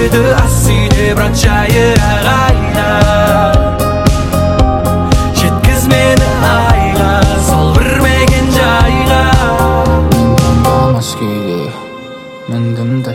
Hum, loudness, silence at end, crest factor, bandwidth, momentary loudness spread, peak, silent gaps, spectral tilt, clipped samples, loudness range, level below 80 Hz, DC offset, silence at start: none; -10 LUFS; 0 s; 10 dB; 17 kHz; 7 LU; 0 dBFS; none; -5.5 dB/octave; 0.3%; 2 LU; -18 dBFS; under 0.1%; 0 s